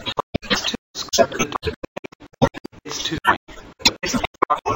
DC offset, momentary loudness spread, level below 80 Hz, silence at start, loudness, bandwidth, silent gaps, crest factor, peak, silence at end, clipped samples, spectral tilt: under 0.1%; 15 LU; -42 dBFS; 0 s; -22 LUFS; 16.5 kHz; 0.23-0.33 s, 0.78-0.94 s, 1.76-1.82 s, 1.88-2.03 s, 2.15-2.19 s, 2.60-2.64 s, 3.37-3.47 s, 4.27-4.34 s; 22 dB; 0 dBFS; 0 s; under 0.1%; -3 dB/octave